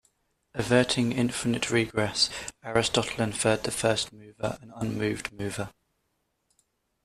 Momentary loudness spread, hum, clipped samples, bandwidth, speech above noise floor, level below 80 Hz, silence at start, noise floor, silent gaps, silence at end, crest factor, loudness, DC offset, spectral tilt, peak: 10 LU; none; under 0.1%; 14.5 kHz; 49 dB; -56 dBFS; 0.55 s; -76 dBFS; none; 1.35 s; 22 dB; -27 LUFS; under 0.1%; -4 dB/octave; -6 dBFS